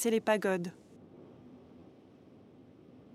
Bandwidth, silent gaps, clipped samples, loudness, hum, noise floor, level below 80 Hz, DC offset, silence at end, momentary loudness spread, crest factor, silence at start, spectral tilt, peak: 15.5 kHz; none; under 0.1%; -32 LUFS; none; -57 dBFS; -80 dBFS; under 0.1%; 0.5 s; 28 LU; 22 dB; 0 s; -4.5 dB/octave; -14 dBFS